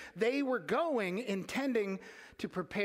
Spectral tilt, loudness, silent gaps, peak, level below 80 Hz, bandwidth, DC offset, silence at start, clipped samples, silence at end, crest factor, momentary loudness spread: -5.5 dB/octave; -35 LUFS; none; -18 dBFS; -72 dBFS; 16 kHz; under 0.1%; 0 s; under 0.1%; 0 s; 16 dB; 11 LU